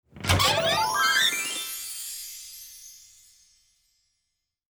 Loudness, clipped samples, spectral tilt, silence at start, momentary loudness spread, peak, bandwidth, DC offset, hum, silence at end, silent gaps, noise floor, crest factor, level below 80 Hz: -24 LUFS; under 0.1%; -2 dB/octave; 0.15 s; 21 LU; -4 dBFS; over 20 kHz; under 0.1%; none; 1.8 s; none; -81 dBFS; 26 dB; -52 dBFS